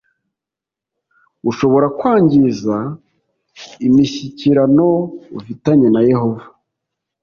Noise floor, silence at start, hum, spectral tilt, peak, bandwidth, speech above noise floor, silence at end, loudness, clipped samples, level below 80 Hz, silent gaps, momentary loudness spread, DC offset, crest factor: -86 dBFS; 1.45 s; none; -8 dB/octave; -2 dBFS; 7 kHz; 73 dB; 0.8 s; -14 LUFS; under 0.1%; -52 dBFS; none; 15 LU; under 0.1%; 14 dB